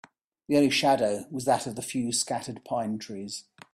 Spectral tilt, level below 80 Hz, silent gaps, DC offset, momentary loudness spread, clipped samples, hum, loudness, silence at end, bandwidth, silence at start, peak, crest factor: -3.5 dB/octave; -68 dBFS; none; under 0.1%; 14 LU; under 0.1%; none; -27 LUFS; 0.35 s; 15 kHz; 0.5 s; -10 dBFS; 18 dB